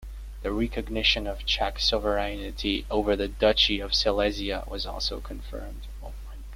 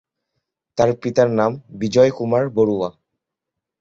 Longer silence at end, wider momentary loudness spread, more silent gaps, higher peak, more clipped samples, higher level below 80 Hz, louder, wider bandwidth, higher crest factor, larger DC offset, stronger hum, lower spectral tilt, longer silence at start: second, 0 s vs 0.9 s; first, 18 LU vs 10 LU; neither; second, -8 dBFS vs -2 dBFS; neither; first, -36 dBFS vs -56 dBFS; second, -26 LUFS vs -19 LUFS; first, 16 kHz vs 7.6 kHz; about the same, 20 dB vs 18 dB; neither; neither; second, -4 dB/octave vs -6.5 dB/octave; second, 0 s vs 0.75 s